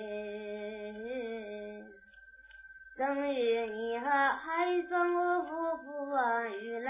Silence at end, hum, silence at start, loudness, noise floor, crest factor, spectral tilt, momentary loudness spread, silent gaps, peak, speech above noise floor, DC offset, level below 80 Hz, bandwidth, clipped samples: 0 s; none; 0 s; -33 LUFS; -57 dBFS; 18 dB; -2 dB/octave; 20 LU; none; -16 dBFS; 25 dB; under 0.1%; -72 dBFS; 3.8 kHz; under 0.1%